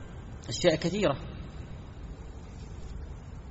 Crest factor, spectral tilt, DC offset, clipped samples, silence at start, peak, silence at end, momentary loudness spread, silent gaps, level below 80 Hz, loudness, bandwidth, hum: 24 dB; -5 dB/octave; under 0.1%; under 0.1%; 0 s; -10 dBFS; 0 s; 18 LU; none; -44 dBFS; -30 LUFS; 8 kHz; none